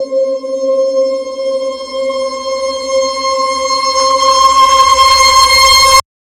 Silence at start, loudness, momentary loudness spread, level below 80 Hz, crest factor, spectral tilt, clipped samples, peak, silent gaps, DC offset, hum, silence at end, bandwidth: 0 s; -9 LUFS; 12 LU; -36 dBFS; 10 dB; 0 dB/octave; 0.4%; 0 dBFS; none; under 0.1%; none; 0.25 s; 17 kHz